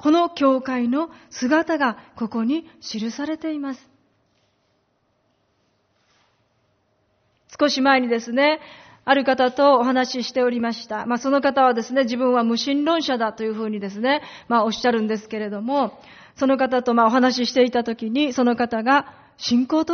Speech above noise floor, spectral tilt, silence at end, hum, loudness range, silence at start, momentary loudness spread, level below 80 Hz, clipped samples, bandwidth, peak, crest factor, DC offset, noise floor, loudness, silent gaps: 47 dB; -2 dB/octave; 0 s; none; 10 LU; 0 s; 10 LU; -64 dBFS; under 0.1%; 6.6 kHz; -2 dBFS; 18 dB; under 0.1%; -67 dBFS; -21 LUFS; none